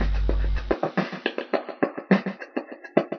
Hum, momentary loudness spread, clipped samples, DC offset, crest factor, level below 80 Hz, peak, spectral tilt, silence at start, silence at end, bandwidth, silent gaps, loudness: none; 9 LU; under 0.1%; under 0.1%; 22 dB; -30 dBFS; -4 dBFS; -5.5 dB/octave; 0 s; 0 s; 6.2 kHz; none; -27 LUFS